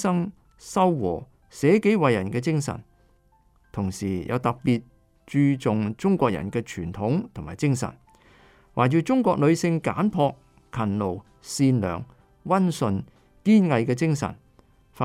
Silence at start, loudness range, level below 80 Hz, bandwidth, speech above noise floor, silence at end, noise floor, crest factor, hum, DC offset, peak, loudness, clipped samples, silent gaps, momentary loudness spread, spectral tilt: 0 s; 3 LU; -54 dBFS; 14.5 kHz; 38 dB; 0 s; -61 dBFS; 18 dB; none; under 0.1%; -6 dBFS; -24 LUFS; under 0.1%; none; 13 LU; -7 dB/octave